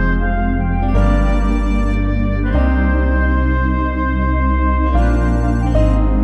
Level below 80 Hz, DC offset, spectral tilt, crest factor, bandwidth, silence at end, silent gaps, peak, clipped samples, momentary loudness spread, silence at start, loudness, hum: -16 dBFS; under 0.1%; -8.5 dB/octave; 12 dB; 6.6 kHz; 0 s; none; -2 dBFS; under 0.1%; 3 LU; 0 s; -16 LUFS; none